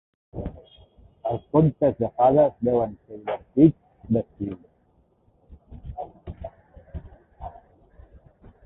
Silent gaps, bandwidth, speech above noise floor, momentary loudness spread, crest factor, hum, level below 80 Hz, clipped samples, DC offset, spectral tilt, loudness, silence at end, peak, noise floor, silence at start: none; 3.9 kHz; 41 dB; 23 LU; 22 dB; none; -48 dBFS; under 0.1%; under 0.1%; -13 dB/octave; -23 LUFS; 1.15 s; -4 dBFS; -63 dBFS; 0.35 s